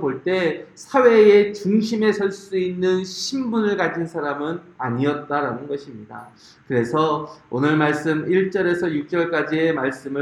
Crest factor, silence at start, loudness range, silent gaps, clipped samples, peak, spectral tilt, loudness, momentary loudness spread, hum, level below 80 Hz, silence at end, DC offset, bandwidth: 18 dB; 0 s; 6 LU; none; under 0.1%; -2 dBFS; -6 dB/octave; -20 LUFS; 12 LU; none; -64 dBFS; 0 s; under 0.1%; 11.5 kHz